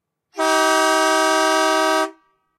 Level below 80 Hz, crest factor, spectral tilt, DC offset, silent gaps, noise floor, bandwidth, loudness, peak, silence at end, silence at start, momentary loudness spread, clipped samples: -74 dBFS; 14 dB; 0.5 dB/octave; under 0.1%; none; -47 dBFS; 16 kHz; -17 LUFS; -4 dBFS; 0.45 s; 0.35 s; 7 LU; under 0.1%